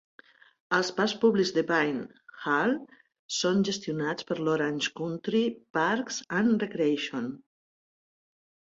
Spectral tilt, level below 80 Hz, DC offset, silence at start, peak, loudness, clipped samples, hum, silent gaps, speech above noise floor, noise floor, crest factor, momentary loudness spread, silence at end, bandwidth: -4.5 dB/octave; -72 dBFS; under 0.1%; 0.7 s; -10 dBFS; -28 LUFS; under 0.1%; none; 3.19-3.29 s, 5.70-5.74 s; over 62 dB; under -90 dBFS; 18 dB; 9 LU; 1.35 s; 8 kHz